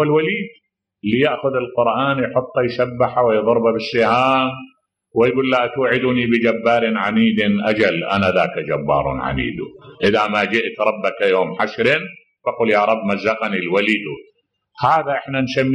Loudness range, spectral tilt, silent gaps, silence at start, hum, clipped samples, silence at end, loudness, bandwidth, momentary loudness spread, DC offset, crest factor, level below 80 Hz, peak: 2 LU; -6.5 dB/octave; none; 0 s; none; under 0.1%; 0 s; -18 LUFS; 10.5 kHz; 7 LU; under 0.1%; 14 dB; -48 dBFS; -4 dBFS